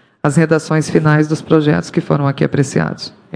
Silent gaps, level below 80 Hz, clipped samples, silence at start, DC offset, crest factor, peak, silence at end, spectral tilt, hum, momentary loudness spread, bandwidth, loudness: none; -48 dBFS; 0.2%; 0.25 s; under 0.1%; 14 dB; 0 dBFS; 0 s; -6.5 dB/octave; none; 4 LU; 10.5 kHz; -15 LUFS